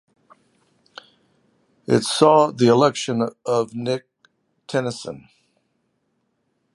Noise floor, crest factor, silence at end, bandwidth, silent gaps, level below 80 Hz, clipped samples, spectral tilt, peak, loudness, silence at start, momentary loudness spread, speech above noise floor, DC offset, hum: -71 dBFS; 22 dB; 1.55 s; 11.5 kHz; none; -66 dBFS; under 0.1%; -5 dB/octave; 0 dBFS; -19 LUFS; 1.9 s; 17 LU; 52 dB; under 0.1%; none